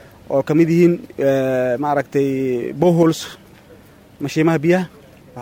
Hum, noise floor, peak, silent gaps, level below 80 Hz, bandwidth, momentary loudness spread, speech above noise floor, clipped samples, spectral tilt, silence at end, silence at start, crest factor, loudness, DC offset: none; -45 dBFS; -2 dBFS; none; -56 dBFS; 16.5 kHz; 9 LU; 28 dB; under 0.1%; -7 dB/octave; 0 s; 0.3 s; 16 dB; -17 LUFS; under 0.1%